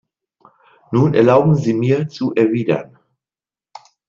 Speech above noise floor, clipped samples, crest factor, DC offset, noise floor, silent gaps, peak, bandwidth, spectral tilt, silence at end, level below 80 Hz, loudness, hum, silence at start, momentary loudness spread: over 75 dB; under 0.1%; 16 dB; under 0.1%; under -90 dBFS; none; -2 dBFS; 7.4 kHz; -8.5 dB/octave; 1.25 s; -56 dBFS; -16 LUFS; none; 0.9 s; 9 LU